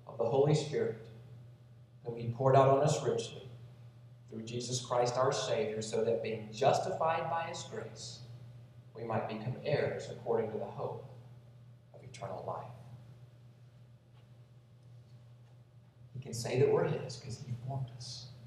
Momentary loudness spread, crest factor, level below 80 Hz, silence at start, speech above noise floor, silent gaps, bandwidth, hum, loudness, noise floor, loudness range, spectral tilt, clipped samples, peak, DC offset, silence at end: 23 LU; 22 dB; -72 dBFS; 0.05 s; 25 dB; none; 13 kHz; none; -34 LUFS; -59 dBFS; 16 LU; -5.5 dB/octave; under 0.1%; -14 dBFS; under 0.1%; 0 s